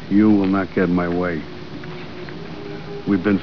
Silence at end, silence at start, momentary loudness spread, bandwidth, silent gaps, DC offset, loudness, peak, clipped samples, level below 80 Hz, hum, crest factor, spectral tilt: 0 s; 0 s; 18 LU; 5.4 kHz; none; 1%; -19 LUFS; -4 dBFS; under 0.1%; -48 dBFS; none; 16 dB; -9 dB/octave